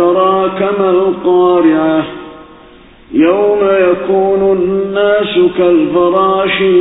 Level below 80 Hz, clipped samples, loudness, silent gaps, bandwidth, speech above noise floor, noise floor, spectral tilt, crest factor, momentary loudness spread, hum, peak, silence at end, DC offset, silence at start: -46 dBFS; under 0.1%; -11 LUFS; none; 4 kHz; 29 dB; -39 dBFS; -10.5 dB/octave; 10 dB; 4 LU; none; 0 dBFS; 0 s; under 0.1%; 0 s